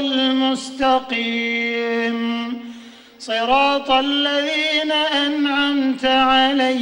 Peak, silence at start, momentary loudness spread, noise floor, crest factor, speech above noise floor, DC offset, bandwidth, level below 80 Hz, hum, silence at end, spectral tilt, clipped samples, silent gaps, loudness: -4 dBFS; 0 s; 8 LU; -41 dBFS; 14 dB; 22 dB; under 0.1%; 16 kHz; -52 dBFS; none; 0 s; -3 dB/octave; under 0.1%; none; -18 LUFS